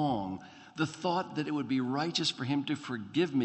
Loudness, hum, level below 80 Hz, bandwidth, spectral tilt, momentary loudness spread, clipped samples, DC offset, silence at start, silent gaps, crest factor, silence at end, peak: -33 LUFS; none; -70 dBFS; 8.4 kHz; -5 dB/octave; 6 LU; under 0.1%; under 0.1%; 0 s; none; 16 dB; 0 s; -16 dBFS